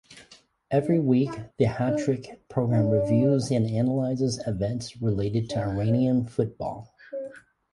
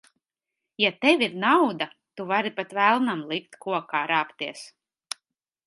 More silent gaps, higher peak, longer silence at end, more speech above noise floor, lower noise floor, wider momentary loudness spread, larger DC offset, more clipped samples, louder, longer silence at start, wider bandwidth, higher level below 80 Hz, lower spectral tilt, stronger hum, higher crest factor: neither; second, -8 dBFS vs -4 dBFS; second, 0.35 s vs 1 s; second, 30 dB vs 61 dB; second, -55 dBFS vs -86 dBFS; second, 13 LU vs 17 LU; neither; neither; about the same, -26 LUFS vs -24 LUFS; second, 0.1 s vs 0.8 s; about the same, 11.5 kHz vs 11.5 kHz; first, -52 dBFS vs -80 dBFS; first, -7.5 dB/octave vs -4 dB/octave; neither; second, 16 dB vs 22 dB